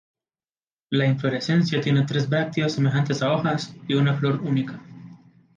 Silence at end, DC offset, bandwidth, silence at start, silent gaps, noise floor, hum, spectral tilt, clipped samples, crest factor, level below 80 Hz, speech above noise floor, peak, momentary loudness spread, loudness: 0.4 s; under 0.1%; 7.4 kHz; 0.9 s; none; under -90 dBFS; none; -6.5 dB/octave; under 0.1%; 14 dB; -64 dBFS; over 68 dB; -10 dBFS; 5 LU; -23 LUFS